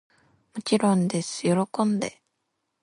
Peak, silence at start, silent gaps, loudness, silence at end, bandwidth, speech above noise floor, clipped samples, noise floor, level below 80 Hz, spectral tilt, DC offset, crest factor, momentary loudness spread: -8 dBFS; 0.55 s; none; -25 LUFS; 0.75 s; 11.5 kHz; 54 dB; under 0.1%; -78 dBFS; -70 dBFS; -5.5 dB/octave; under 0.1%; 18 dB; 12 LU